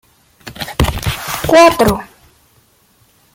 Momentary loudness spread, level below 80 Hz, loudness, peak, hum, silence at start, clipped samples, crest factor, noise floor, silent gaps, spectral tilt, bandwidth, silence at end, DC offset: 16 LU; -30 dBFS; -13 LUFS; 0 dBFS; none; 0.45 s; under 0.1%; 16 dB; -53 dBFS; none; -4.5 dB/octave; 17 kHz; 1.3 s; under 0.1%